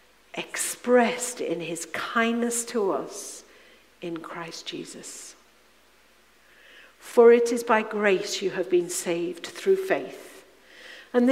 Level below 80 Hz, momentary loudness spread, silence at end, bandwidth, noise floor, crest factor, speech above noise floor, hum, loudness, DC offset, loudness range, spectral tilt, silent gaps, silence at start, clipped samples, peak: -72 dBFS; 18 LU; 0 s; 16 kHz; -59 dBFS; 20 dB; 34 dB; none; -25 LUFS; under 0.1%; 16 LU; -3.5 dB/octave; none; 0.35 s; under 0.1%; -6 dBFS